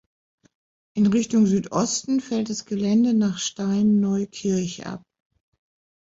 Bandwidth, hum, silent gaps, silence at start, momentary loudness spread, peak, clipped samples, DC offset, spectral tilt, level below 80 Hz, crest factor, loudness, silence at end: 7.8 kHz; none; none; 0.95 s; 10 LU; -10 dBFS; under 0.1%; under 0.1%; -5.5 dB/octave; -60 dBFS; 14 dB; -22 LUFS; 1.05 s